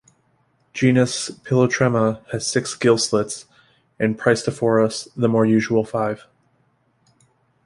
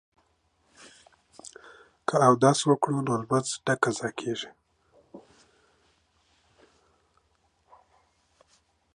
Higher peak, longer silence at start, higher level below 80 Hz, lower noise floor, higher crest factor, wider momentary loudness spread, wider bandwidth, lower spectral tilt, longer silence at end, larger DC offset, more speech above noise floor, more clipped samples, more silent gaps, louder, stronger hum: first, -2 dBFS vs -6 dBFS; second, 0.75 s vs 1.45 s; first, -58 dBFS vs -72 dBFS; second, -63 dBFS vs -70 dBFS; second, 18 dB vs 24 dB; second, 9 LU vs 25 LU; about the same, 11.5 kHz vs 11 kHz; about the same, -5 dB/octave vs -5 dB/octave; second, 1.5 s vs 3.75 s; neither; about the same, 44 dB vs 45 dB; neither; neither; first, -20 LUFS vs -25 LUFS; neither